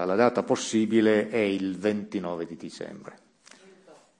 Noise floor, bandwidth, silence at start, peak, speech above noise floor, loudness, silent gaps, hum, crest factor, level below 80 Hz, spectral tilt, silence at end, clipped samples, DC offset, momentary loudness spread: -55 dBFS; 10.5 kHz; 0 s; -8 dBFS; 29 dB; -26 LUFS; none; none; 20 dB; -72 dBFS; -5 dB/octave; 1.05 s; under 0.1%; under 0.1%; 17 LU